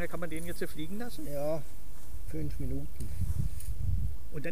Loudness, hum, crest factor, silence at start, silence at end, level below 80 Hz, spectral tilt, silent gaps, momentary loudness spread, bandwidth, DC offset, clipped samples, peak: -38 LUFS; none; 14 dB; 0 s; 0 s; -40 dBFS; -6.5 dB/octave; none; 7 LU; 15.5 kHz; 5%; under 0.1%; -18 dBFS